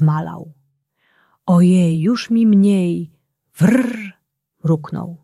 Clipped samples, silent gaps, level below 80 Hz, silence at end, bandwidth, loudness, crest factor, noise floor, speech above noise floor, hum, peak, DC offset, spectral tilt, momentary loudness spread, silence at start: under 0.1%; none; -60 dBFS; 0.05 s; 12.5 kHz; -16 LUFS; 14 dB; -64 dBFS; 49 dB; none; -2 dBFS; under 0.1%; -8 dB/octave; 17 LU; 0 s